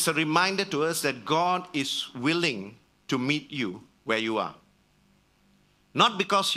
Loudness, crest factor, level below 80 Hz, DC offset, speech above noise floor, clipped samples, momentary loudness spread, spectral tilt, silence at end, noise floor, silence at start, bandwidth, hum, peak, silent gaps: -26 LUFS; 22 dB; -70 dBFS; under 0.1%; 37 dB; under 0.1%; 11 LU; -3.5 dB/octave; 0 s; -64 dBFS; 0 s; 15.5 kHz; 50 Hz at -60 dBFS; -6 dBFS; none